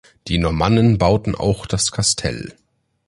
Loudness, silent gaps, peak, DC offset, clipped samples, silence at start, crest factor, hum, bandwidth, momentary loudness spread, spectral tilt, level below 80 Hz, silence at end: -18 LUFS; none; -2 dBFS; under 0.1%; under 0.1%; 0.25 s; 16 dB; none; 11.5 kHz; 10 LU; -5 dB/octave; -34 dBFS; 0.55 s